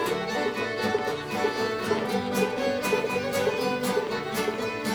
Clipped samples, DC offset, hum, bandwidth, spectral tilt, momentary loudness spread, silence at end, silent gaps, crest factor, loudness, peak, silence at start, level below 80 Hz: under 0.1%; under 0.1%; none; over 20 kHz; -4 dB/octave; 3 LU; 0 s; none; 18 dB; -27 LUFS; -10 dBFS; 0 s; -60 dBFS